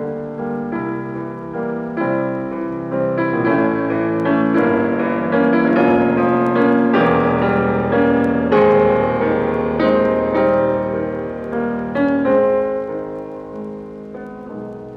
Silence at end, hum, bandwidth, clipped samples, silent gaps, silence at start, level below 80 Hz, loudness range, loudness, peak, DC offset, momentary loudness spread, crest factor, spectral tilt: 0 s; none; 5.8 kHz; under 0.1%; none; 0 s; -46 dBFS; 6 LU; -17 LUFS; -2 dBFS; under 0.1%; 15 LU; 14 dB; -9 dB/octave